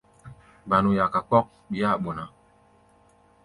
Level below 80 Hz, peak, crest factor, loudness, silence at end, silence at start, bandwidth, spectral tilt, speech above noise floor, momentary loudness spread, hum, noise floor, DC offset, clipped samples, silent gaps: -54 dBFS; -6 dBFS; 22 dB; -24 LUFS; 1.15 s; 0.25 s; 11 kHz; -8 dB/octave; 35 dB; 16 LU; none; -59 dBFS; under 0.1%; under 0.1%; none